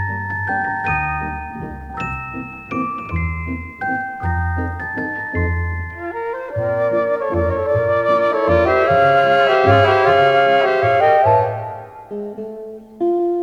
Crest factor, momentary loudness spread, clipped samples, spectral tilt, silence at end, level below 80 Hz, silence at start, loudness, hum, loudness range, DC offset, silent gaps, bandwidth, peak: 16 dB; 16 LU; under 0.1%; -7.5 dB/octave; 0 s; -40 dBFS; 0 s; -17 LUFS; none; 10 LU; under 0.1%; none; 7.4 kHz; -2 dBFS